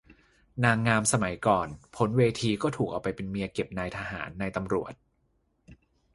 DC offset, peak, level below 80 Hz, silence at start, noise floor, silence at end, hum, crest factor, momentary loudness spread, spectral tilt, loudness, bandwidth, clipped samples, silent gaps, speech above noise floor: under 0.1%; -6 dBFS; -54 dBFS; 0.55 s; -72 dBFS; 0.4 s; none; 24 dB; 10 LU; -5 dB/octave; -28 LUFS; 11.5 kHz; under 0.1%; none; 44 dB